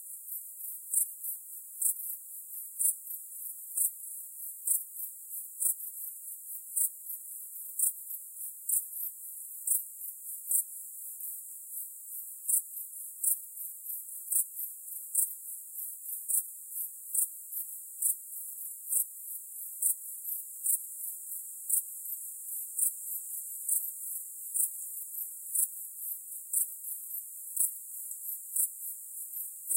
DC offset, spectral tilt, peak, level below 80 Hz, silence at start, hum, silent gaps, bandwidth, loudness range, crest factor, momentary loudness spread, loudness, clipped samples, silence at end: under 0.1%; 6.5 dB/octave; -12 dBFS; under -90 dBFS; 0 s; none; none; 16 kHz; 1 LU; 24 dB; 10 LU; -33 LUFS; under 0.1%; 0 s